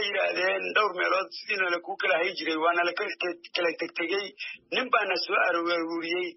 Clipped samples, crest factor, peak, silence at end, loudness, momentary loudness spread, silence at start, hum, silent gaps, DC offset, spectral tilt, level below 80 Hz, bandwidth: under 0.1%; 18 dB; -10 dBFS; 0.05 s; -27 LUFS; 6 LU; 0 s; none; none; under 0.1%; 1 dB/octave; -84 dBFS; 6 kHz